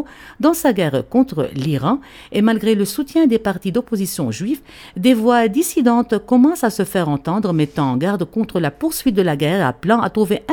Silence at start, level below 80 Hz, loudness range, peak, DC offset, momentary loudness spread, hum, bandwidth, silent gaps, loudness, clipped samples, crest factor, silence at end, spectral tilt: 0 s; -48 dBFS; 2 LU; 0 dBFS; under 0.1%; 7 LU; none; 19.5 kHz; none; -17 LUFS; under 0.1%; 16 dB; 0 s; -6 dB/octave